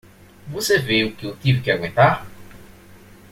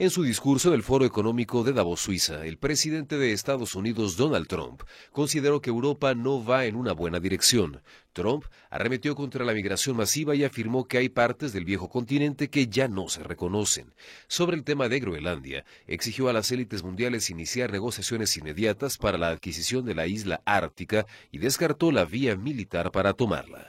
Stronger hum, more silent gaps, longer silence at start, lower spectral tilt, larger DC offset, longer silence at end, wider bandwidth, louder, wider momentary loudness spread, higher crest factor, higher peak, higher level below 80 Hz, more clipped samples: neither; neither; first, 0.45 s vs 0 s; about the same, -5 dB/octave vs -4 dB/octave; neither; first, 0.65 s vs 0 s; about the same, 16.5 kHz vs 16.5 kHz; first, -19 LUFS vs -27 LUFS; about the same, 10 LU vs 8 LU; about the same, 20 dB vs 22 dB; about the same, -2 dBFS vs -4 dBFS; about the same, -50 dBFS vs -52 dBFS; neither